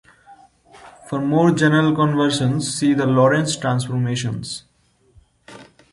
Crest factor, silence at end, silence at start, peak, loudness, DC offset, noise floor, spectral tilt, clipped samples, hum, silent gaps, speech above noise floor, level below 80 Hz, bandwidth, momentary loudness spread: 16 dB; 0.3 s; 0.3 s; -4 dBFS; -18 LUFS; under 0.1%; -56 dBFS; -5.5 dB/octave; under 0.1%; none; none; 39 dB; -56 dBFS; 11.5 kHz; 11 LU